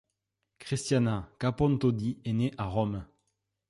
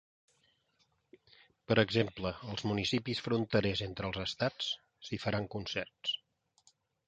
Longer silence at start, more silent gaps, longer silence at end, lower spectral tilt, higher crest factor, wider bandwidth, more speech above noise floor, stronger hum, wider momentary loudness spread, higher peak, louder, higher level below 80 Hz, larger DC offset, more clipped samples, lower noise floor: second, 0.6 s vs 1.7 s; neither; second, 0.65 s vs 0.9 s; about the same, -6.5 dB/octave vs -5.5 dB/octave; second, 16 dB vs 26 dB; first, 11.5 kHz vs 9 kHz; first, 54 dB vs 42 dB; neither; about the same, 8 LU vs 8 LU; second, -14 dBFS vs -10 dBFS; first, -30 LUFS vs -35 LUFS; first, -52 dBFS vs -60 dBFS; neither; neither; first, -83 dBFS vs -76 dBFS